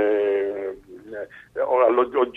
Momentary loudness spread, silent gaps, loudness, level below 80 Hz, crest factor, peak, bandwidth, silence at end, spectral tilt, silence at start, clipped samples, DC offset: 18 LU; none; -21 LUFS; -62 dBFS; 16 dB; -6 dBFS; 4 kHz; 0.05 s; -6.5 dB/octave; 0 s; under 0.1%; under 0.1%